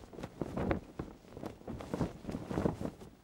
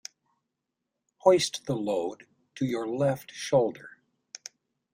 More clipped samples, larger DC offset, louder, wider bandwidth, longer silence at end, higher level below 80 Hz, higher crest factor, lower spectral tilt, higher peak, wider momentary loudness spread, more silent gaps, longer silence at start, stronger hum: neither; neither; second, -40 LUFS vs -28 LUFS; about the same, 16.5 kHz vs 16 kHz; second, 0 s vs 1.05 s; first, -52 dBFS vs -70 dBFS; about the same, 24 dB vs 24 dB; first, -7.5 dB/octave vs -5 dB/octave; second, -16 dBFS vs -6 dBFS; second, 12 LU vs 23 LU; neither; second, 0 s vs 1.25 s; neither